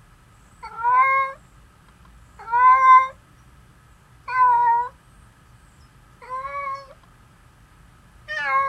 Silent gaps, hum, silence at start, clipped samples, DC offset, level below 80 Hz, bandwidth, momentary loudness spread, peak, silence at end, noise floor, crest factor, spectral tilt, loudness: none; none; 0.65 s; under 0.1%; under 0.1%; -54 dBFS; 8.8 kHz; 22 LU; -4 dBFS; 0 s; -52 dBFS; 18 dB; -3 dB/octave; -18 LUFS